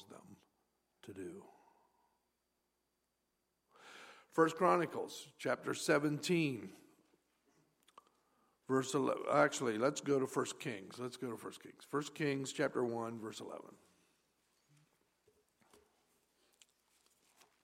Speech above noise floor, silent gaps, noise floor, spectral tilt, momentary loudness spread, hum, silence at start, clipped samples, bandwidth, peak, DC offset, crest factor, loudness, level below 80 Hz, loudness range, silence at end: 48 dB; none; -85 dBFS; -5 dB/octave; 20 LU; none; 0.1 s; under 0.1%; 16 kHz; -16 dBFS; under 0.1%; 24 dB; -37 LUFS; -88 dBFS; 21 LU; 3.95 s